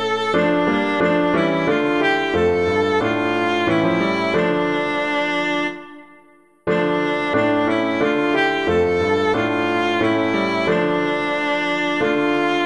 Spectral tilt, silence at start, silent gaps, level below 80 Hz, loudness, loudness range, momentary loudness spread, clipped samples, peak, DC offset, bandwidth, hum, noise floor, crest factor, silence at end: -6 dB/octave; 0 s; none; -50 dBFS; -19 LUFS; 3 LU; 2 LU; under 0.1%; -6 dBFS; 0.3%; 11 kHz; none; -51 dBFS; 12 dB; 0 s